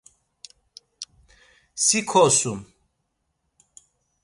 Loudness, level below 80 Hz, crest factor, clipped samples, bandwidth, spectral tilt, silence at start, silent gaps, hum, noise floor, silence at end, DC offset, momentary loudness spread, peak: -19 LUFS; -62 dBFS; 22 dB; under 0.1%; 11.5 kHz; -2.5 dB/octave; 1 s; none; none; -75 dBFS; 1.6 s; under 0.1%; 23 LU; -4 dBFS